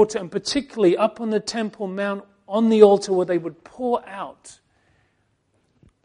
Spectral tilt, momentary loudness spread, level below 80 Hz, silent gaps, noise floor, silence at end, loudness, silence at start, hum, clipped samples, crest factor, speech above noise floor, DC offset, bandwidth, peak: -5 dB/octave; 18 LU; -62 dBFS; none; -67 dBFS; 1.55 s; -21 LUFS; 0 s; none; under 0.1%; 22 dB; 47 dB; under 0.1%; 10.5 kHz; 0 dBFS